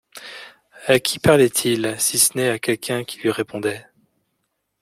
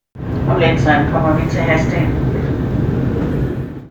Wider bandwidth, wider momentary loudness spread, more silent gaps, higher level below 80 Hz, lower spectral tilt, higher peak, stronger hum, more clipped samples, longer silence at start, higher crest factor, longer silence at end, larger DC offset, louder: first, 16.5 kHz vs 7.6 kHz; first, 20 LU vs 7 LU; neither; second, -54 dBFS vs -28 dBFS; second, -3 dB/octave vs -7.5 dB/octave; about the same, -2 dBFS vs 0 dBFS; neither; neither; about the same, 0.15 s vs 0.15 s; about the same, 20 dB vs 16 dB; first, 1 s vs 0 s; neither; second, -19 LUFS vs -16 LUFS